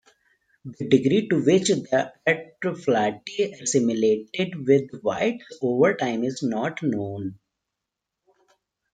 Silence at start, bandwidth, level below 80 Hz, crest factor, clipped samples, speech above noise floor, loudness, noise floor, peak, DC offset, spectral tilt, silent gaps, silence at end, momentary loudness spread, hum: 0.65 s; 9.4 kHz; -66 dBFS; 20 dB; under 0.1%; 61 dB; -23 LUFS; -84 dBFS; -4 dBFS; under 0.1%; -5 dB/octave; none; 1.6 s; 9 LU; none